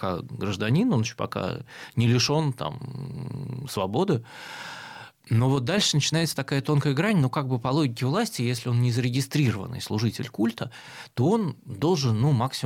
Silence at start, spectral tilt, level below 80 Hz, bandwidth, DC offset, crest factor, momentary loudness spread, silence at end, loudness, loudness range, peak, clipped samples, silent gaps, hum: 0 s; -5.5 dB/octave; -60 dBFS; 16 kHz; under 0.1%; 14 dB; 14 LU; 0 s; -25 LUFS; 3 LU; -10 dBFS; under 0.1%; none; none